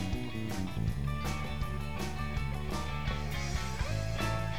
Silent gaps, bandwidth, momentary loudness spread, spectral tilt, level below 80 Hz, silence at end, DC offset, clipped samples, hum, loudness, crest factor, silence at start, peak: none; 19 kHz; 3 LU; -5.5 dB/octave; -40 dBFS; 0 s; 0.9%; under 0.1%; none; -36 LUFS; 14 dB; 0 s; -22 dBFS